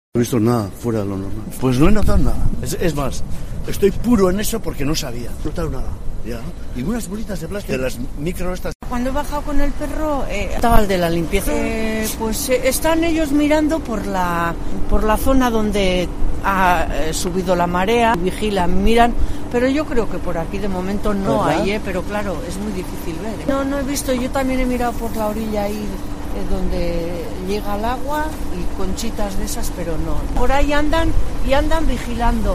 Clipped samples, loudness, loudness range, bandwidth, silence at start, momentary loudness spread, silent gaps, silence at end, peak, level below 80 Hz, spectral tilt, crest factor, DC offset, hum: under 0.1%; -20 LUFS; 6 LU; 15.5 kHz; 0.15 s; 11 LU; 8.75-8.80 s; 0 s; 0 dBFS; -24 dBFS; -5.5 dB/octave; 16 dB; under 0.1%; none